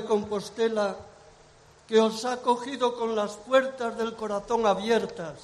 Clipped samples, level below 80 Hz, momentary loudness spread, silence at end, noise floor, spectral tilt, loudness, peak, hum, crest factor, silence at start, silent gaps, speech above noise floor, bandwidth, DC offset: under 0.1%; -62 dBFS; 8 LU; 0 s; -55 dBFS; -4.5 dB/octave; -27 LUFS; -8 dBFS; none; 18 dB; 0 s; none; 29 dB; 12.5 kHz; under 0.1%